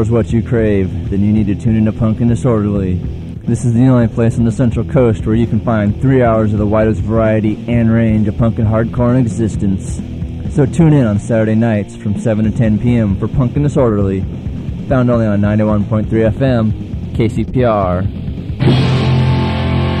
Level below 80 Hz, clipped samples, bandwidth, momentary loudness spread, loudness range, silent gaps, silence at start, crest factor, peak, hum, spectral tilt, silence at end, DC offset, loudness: -28 dBFS; under 0.1%; 9.8 kHz; 7 LU; 2 LU; none; 0 s; 12 dB; 0 dBFS; none; -8.5 dB/octave; 0 s; under 0.1%; -14 LUFS